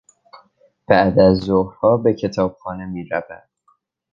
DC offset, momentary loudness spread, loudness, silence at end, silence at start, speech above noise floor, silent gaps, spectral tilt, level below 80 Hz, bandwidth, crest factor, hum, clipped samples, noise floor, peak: under 0.1%; 15 LU; -18 LUFS; 0.75 s; 0.35 s; 45 dB; none; -8 dB/octave; -44 dBFS; 7.4 kHz; 18 dB; none; under 0.1%; -62 dBFS; -2 dBFS